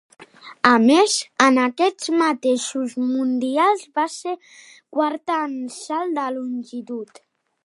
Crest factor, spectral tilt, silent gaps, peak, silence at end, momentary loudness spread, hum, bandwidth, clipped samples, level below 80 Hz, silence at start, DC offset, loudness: 20 dB; -3 dB/octave; none; 0 dBFS; 0.6 s; 15 LU; none; 11.5 kHz; under 0.1%; -70 dBFS; 0.2 s; under 0.1%; -20 LUFS